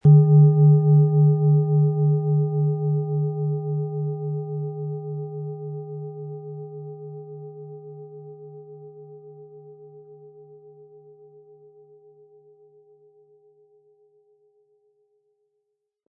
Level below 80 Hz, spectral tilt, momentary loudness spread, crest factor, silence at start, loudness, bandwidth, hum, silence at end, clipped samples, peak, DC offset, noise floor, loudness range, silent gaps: -64 dBFS; -15.5 dB/octave; 27 LU; 18 dB; 0.05 s; -21 LUFS; 1.3 kHz; none; 5.95 s; under 0.1%; -6 dBFS; under 0.1%; -78 dBFS; 26 LU; none